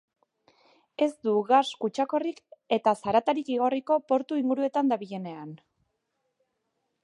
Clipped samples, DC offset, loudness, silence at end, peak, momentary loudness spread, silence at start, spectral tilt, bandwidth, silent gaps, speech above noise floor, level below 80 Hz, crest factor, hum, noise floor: under 0.1%; under 0.1%; -27 LUFS; 1.5 s; -8 dBFS; 14 LU; 1 s; -5.5 dB/octave; 11 kHz; none; 52 dB; -74 dBFS; 20 dB; none; -79 dBFS